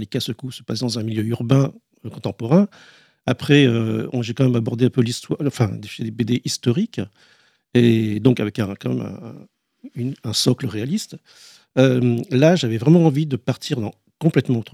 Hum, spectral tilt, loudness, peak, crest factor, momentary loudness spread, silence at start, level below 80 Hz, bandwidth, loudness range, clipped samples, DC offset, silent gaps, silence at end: none; -6.5 dB/octave; -20 LUFS; -2 dBFS; 18 dB; 14 LU; 0 s; -60 dBFS; 15 kHz; 4 LU; under 0.1%; under 0.1%; none; 0.1 s